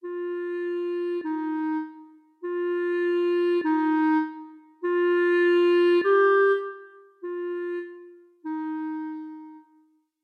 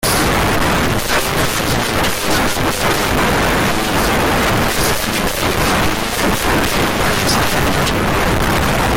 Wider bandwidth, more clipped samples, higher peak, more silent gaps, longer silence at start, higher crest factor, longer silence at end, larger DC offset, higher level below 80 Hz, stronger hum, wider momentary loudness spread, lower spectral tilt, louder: second, 4.8 kHz vs 17 kHz; neither; second, -10 dBFS vs -4 dBFS; neither; about the same, 0.05 s vs 0 s; about the same, 14 dB vs 12 dB; first, 0.65 s vs 0 s; neither; second, -88 dBFS vs -26 dBFS; neither; first, 19 LU vs 2 LU; first, -5 dB/octave vs -3.5 dB/octave; second, -25 LUFS vs -15 LUFS